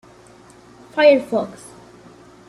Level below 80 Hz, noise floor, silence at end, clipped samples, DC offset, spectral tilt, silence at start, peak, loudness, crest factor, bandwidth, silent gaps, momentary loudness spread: -62 dBFS; -46 dBFS; 1 s; under 0.1%; under 0.1%; -5 dB/octave; 0.95 s; -2 dBFS; -17 LUFS; 18 dB; 12 kHz; none; 19 LU